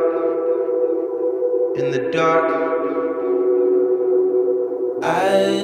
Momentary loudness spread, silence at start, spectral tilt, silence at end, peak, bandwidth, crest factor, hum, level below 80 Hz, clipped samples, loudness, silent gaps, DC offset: 5 LU; 0 s; -6 dB/octave; 0 s; -4 dBFS; 11 kHz; 14 dB; none; -70 dBFS; under 0.1%; -19 LUFS; none; under 0.1%